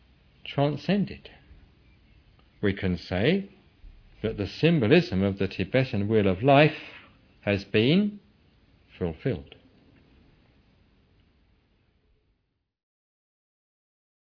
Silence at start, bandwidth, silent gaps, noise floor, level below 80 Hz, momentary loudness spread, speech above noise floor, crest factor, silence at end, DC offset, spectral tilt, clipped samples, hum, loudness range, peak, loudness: 0.45 s; 5.4 kHz; none; -77 dBFS; -54 dBFS; 14 LU; 53 dB; 24 dB; 4.9 s; under 0.1%; -8 dB/octave; under 0.1%; none; 15 LU; -4 dBFS; -25 LUFS